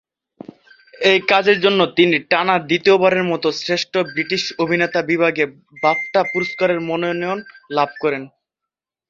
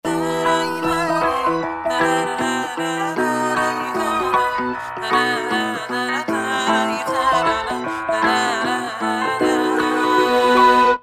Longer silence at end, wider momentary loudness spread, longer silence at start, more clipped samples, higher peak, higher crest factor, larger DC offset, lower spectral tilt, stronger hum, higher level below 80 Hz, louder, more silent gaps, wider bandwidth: first, 0.8 s vs 0.05 s; about the same, 8 LU vs 7 LU; first, 1 s vs 0.05 s; neither; about the same, -2 dBFS vs -2 dBFS; about the same, 18 dB vs 16 dB; neither; first, -5 dB/octave vs -3.5 dB/octave; neither; second, -62 dBFS vs -52 dBFS; about the same, -17 LUFS vs -19 LUFS; neither; second, 7.6 kHz vs 15.5 kHz